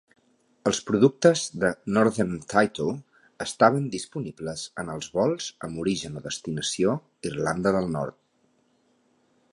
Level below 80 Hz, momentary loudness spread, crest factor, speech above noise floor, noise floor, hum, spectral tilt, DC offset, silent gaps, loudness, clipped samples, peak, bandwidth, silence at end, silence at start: -58 dBFS; 13 LU; 22 dB; 42 dB; -67 dBFS; none; -5 dB/octave; under 0.1%; none; -26 LUFS; under 0.1%; -4 dBFS; 11.5 kHz; 1.4 s; 0.65 s